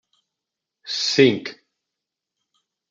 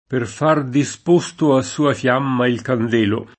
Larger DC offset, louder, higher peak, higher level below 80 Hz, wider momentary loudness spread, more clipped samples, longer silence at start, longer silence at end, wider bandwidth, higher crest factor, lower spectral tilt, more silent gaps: neither; about the same, -19 LUFS vs -18 LUFS; about the same, -2 dBFS vs 0 dBFS; second, -74 dBFS vs -60 dBFS; first, 20 LU vs 4 LU; neither; first, 0.85 s vs 0.1 s; first, 1.35 s vs 0.1 s; second, 7.8 kHz vs 8.8 kHz; first, 22 dB vs 16 dB; second, -4 dB/octave vs -6 dB/octave; neither